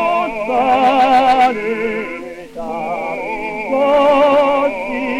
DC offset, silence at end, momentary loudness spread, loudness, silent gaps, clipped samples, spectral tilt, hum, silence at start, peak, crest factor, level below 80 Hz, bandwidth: under 0.1%; 0 s; 13 LU; -15 LUFS; none; under 0.1%; -5 dB/octave; none; 0 s; -2 dBFS; 14 dB; -46 dBFS; 13 kHz